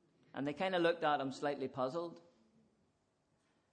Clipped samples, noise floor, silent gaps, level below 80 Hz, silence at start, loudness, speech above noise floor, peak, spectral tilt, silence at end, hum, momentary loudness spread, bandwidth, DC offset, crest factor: under 0.1%; -79 dBFS; none; -84 dBFS; 0.35 s; -37 LUFS; 42 dB; -22 dBFS; -5.5 dB/octave; 1.55 s; none; 11 LU; 9.6 kHz; under 0.1%; 18 dB